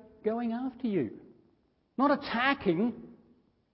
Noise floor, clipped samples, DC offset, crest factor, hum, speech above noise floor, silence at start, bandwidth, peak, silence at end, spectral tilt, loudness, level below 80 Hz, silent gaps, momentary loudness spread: -70 dBFS; under 0.1%; under 0.1%; 20 dB; none; 41 dB; 0.25 s; 5.8 kHz; -12 dBFS; 0.6 s; -9.5 dB/octave; -30 LUFS; -66 dBFS; none; 9 LU